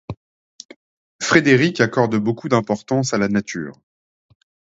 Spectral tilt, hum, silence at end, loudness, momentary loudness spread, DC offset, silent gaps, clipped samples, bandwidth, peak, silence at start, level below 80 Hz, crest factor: -5 dB/octave; none; 0.95 s; -18 LUFS; 16 LU; under 0.1%; 0.17-0.59 s, 0.65-0.69 s, 0.76-1.19 s; under 0.1%; 8 kHz; 0 dBFS; 0.1 s; -56 dBFS; 20 dB